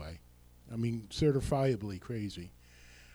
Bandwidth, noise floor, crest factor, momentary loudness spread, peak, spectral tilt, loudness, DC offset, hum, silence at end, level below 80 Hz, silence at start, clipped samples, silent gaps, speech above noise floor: over 20 kHz; -59 dBFS; 16 dB; 18 LU; -18 dBFS; -7 dB/octave; -34 LUFS; under 0.1%; 60 Hz at -55 dBFS; 0.05 s; -52 dBFS; 0 s; under 0.1%; none; 26 dB